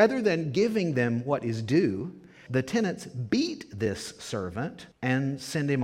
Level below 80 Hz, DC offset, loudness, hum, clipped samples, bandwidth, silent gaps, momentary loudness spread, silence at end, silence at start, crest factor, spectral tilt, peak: -62 dBFS; under 0.1%; -29 LUFS; none; under 0.1%; 15.5 kHz; none; 10 LU; 0 s; 0 s; 20 dB; -6 dB/octave; -8 dBFS